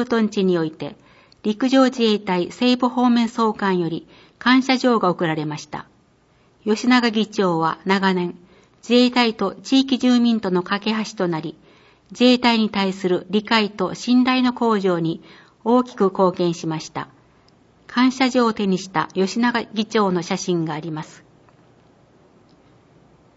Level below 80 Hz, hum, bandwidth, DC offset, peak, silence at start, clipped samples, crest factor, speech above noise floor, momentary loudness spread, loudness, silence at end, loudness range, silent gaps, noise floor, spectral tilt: -64 dBFS; none; 8 kHz; under 0.1%; -2 dBFS; 0 s; under 0.1%; 18 dB; 38 dB; 12 LU; -19 LUFS; 2.3 s; 4 LU; none; -57 dBFS; -5.5 dB/octave